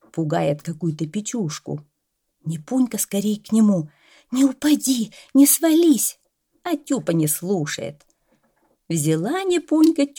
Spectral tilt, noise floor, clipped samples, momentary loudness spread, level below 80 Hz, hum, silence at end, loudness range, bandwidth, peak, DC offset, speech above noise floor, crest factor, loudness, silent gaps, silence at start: -5 dB/octave; -75 dBFS; under 0.1%; 15 LU; -68 dBFS; none; 0.1 s; 6 LU; 19.5 kHz; -4 dBFS; under 0.1%; 55 dB; 18 dB; -20 LUFS; none; 0.15 s